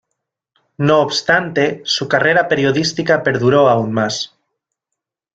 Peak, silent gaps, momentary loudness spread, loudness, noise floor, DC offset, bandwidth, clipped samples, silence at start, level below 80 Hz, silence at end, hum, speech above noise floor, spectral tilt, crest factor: 0 dBFS; none; 7 LU; -15 LUFS; -81 dBFS; under 0.1%; 9.2 kHz; under 0.1%; 0.8 s; -56 dBFS; 1.1 s; none; 66 dB; -4.5 dB/octave; 16 dB